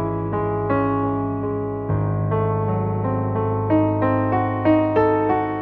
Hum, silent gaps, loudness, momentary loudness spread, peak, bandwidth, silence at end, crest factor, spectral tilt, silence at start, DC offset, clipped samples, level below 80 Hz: none; none; -21 LUFS; 6 LU; -6 dBFS; 4.3 kHz; 0 s; 14 dB; -11.5 dB/octave; 0 s; under 0.1%; under 0.1%; -42 dBFS